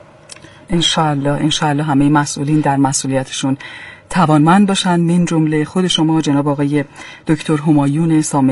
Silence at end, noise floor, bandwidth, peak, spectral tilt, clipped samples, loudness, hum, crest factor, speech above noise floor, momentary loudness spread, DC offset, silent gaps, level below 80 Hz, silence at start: 0 s; -39 dBFS; 11.5 kHz; 0 dBFS; -5 dB/octave; under 0.1%; -14 LUFS; none; 14 dB; 25 dB; 8 LU; under 0.1%; none; -44 dBFS; 0.3 s